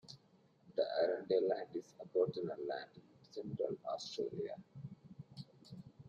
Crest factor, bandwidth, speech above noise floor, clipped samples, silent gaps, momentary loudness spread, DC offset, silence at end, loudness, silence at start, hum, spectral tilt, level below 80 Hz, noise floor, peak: 20 dB; 8.8 kHz; 30 dB; under 0.1%; none; 20 LU; under 0.1%; 0 s; -40 LUFS; 0.05 s; none; -6 dB/octave; -80 dBFS; -70 dBFS; -22 dBFS